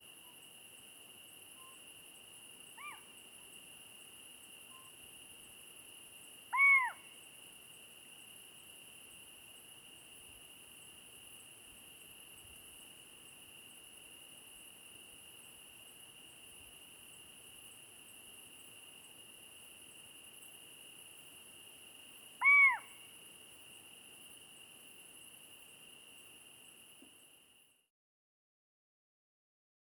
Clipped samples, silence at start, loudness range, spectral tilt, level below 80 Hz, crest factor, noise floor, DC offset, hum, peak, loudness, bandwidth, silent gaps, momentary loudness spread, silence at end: under 0.1%; 0 s; 21 LU; 0.5 dB/octave; -82 dBFS; 24 dB; -68 dBFS; under 0.1%; none; -18 dBFS; -28 LUFS; over 20 kHz; none; 8 LU; 2.25 s